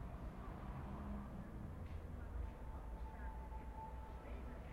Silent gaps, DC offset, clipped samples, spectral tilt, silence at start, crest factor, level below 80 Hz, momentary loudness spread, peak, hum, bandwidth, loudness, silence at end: none; under 0.1%; under 0.1%; -8 dB/octave; 0 s; 12 dB; -50 dBFS; 3 LU; -36 dBFS; none; 14.5 kHz; -52 LUFS; 0 s